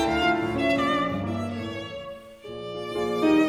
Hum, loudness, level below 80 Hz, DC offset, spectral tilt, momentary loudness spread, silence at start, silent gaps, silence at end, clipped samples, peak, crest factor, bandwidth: none; -26 LUFS; -50 dBFS; under 0.1%; -6 dB/octave; 15 LU; 0 s; none; 0 s; under 0.1%; -10 dBFS; 16 dB; 14 kHz